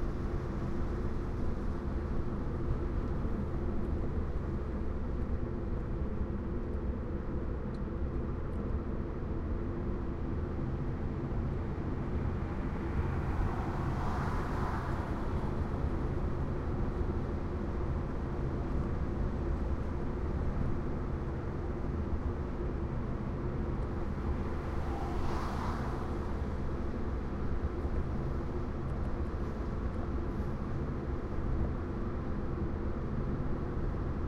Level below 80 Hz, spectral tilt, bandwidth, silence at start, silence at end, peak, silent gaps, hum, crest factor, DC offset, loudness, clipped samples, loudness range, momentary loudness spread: -38 dBFS; -9 dB/octave; 7.8 kHz; 0 s; 0 s; -20 dBFS; none; none; 14 dB; under 0.1%; -37 LUFS; under 0.1%; 2 LU; 3 LU